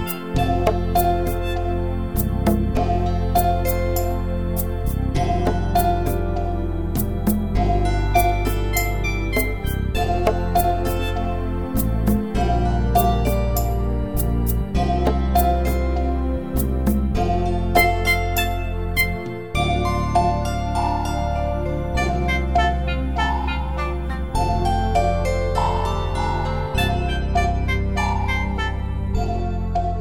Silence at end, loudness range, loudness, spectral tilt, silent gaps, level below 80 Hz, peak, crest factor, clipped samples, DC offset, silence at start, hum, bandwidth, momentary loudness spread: 0 s; 2 LU; -22 LUFS; -6 dB/octave; none; -24 dBFS; -4 dBFS; 18 dB; under 0.1%; 1%; 0 s; none; over 20 kHz; 5 LU